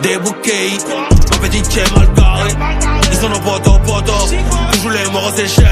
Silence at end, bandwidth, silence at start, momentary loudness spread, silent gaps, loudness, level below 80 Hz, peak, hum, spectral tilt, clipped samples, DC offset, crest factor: 0 s; 15.5 kHz; 0 s; 5 LU; none; -13 LUFS; -14 dBFS; 0 dBFS; none; -4 dB/octave; 0.4%; under 0.1%; 10 dB